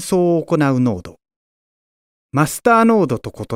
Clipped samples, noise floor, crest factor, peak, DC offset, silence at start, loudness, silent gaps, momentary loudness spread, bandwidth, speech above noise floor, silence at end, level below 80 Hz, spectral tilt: under 0.1%; under -90 dBFS; 18 dB; 0 dBFS; under 0.1%; 0 s; -16 LUFS; 1.36-2.29 s; 11 LU; 16 kHz; over 74 dB; 0 s; -50 dBFS; -6.5 dB/octave